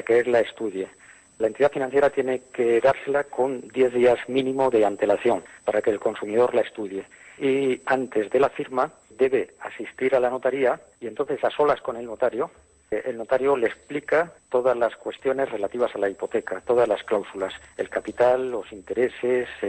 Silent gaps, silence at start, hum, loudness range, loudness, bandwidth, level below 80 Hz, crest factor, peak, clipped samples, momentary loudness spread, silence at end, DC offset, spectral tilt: none; 0 s; none; 3 LU; -24 LUFS; 9.6 kHz; -60 dBFS; 14 dB; -10 dBFS; under 0.1%; 11 LU; 0 s; under 0.1%; -5.5 dB/octave